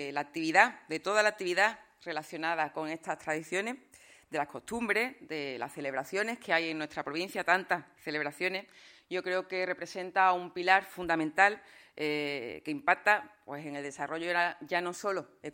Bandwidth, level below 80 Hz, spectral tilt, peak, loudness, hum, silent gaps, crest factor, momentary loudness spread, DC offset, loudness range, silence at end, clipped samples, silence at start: 16.5 kHz; -72 dBFS; -3.5 dB/octave; -8 dBFS; -31 LUFS; none; none; 24 dB; 12 LU; under 0.1%; 5 LU; 0.05 s; under 0.1%; 0 s